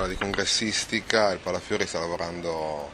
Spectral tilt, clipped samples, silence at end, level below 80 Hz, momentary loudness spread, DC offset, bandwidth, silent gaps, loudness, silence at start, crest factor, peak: -2.5 dB/octave; under 0.1%; 0 s; -46 dBFS; 7 LU; under 0.1%; 16 kHz; none; -26 LUFS; 0 s; 26 dB; -2 dBFS